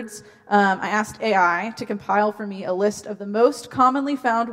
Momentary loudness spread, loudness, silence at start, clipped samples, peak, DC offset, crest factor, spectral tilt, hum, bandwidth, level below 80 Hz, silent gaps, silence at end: 11 LU; -21 LUFS; 0 s; under 0.1%; -2 dBFS; under 0.1%; 18 dB; -5 dB/octave; none; 16 kHz; -64 dBFS; none; 0 s